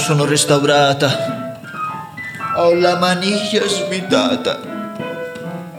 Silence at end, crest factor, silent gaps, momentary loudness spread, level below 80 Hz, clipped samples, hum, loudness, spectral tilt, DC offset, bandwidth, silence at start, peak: 0 s; 16 dB; none; 14 LU; -62 dBFS; under 0.1%; none; -16 LUFS; -4 dB/octave; under 0.1%; 19 kHz; 0 s; 0 dBFS